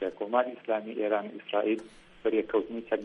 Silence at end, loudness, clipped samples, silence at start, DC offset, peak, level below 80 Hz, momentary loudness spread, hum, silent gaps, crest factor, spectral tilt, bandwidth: 0 s; -31 LUFS; under 0.1%; 0 s; under 0.1%; -12 dBFS; -66 dBFS; 4 LU; none; none; 18 dB; -6.5 dB/octave; 10.5 kHz